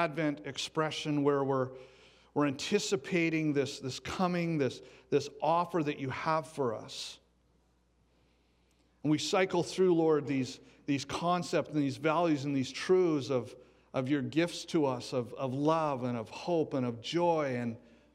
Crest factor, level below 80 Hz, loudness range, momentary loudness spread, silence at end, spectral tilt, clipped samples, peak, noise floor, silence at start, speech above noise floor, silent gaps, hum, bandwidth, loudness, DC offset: 18 dB; -70 dBFS; 4 LU; 9 LU; 0.35 s; -5.5 dB/octave; under 0.1%; -14 dBFS; -70 dBFS; 0 s; 39 dB; none; none; 14 kHz; -32 LUFS; under 0.1%